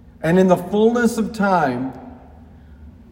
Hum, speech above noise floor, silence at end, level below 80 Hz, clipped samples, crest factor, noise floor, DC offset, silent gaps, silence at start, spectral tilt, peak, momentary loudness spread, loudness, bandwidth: none; 26 dB; 0.2 s; -48 dBFS; under 0.1%; 16 dB; -43 dBFS; under 0.1%; none; 0.2 s; -7 dB/octave; -2 dBFS; 12 LU; -18 LUFS; 16.5 kHz